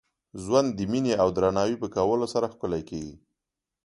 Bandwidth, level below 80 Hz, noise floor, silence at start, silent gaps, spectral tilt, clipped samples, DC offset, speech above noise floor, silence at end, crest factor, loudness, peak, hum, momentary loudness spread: 11.5 kHz; -54 dBFS; -87 dBFS; 0.35 s; none; -6 dB/octave; under 0.1%; under 0.1%; 62 dB; 0.65 s; 20 dB; -26 LUFS; -8 dBFS; none; 14 LU